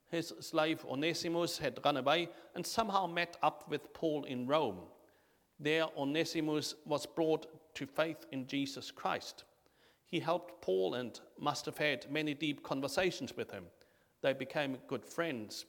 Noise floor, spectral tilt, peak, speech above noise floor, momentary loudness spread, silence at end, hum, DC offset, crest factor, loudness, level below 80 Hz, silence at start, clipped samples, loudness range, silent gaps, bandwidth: -71 dBFS; -4.5 dB/octave; -14 dBFS; 35 dB; 9 LU; 0.05 s; none; under 0.1%; 22 dB; -37 LUFS; -74 dBFS; 0.1 s; under 0.1%; 4 LU; none; 19 kHz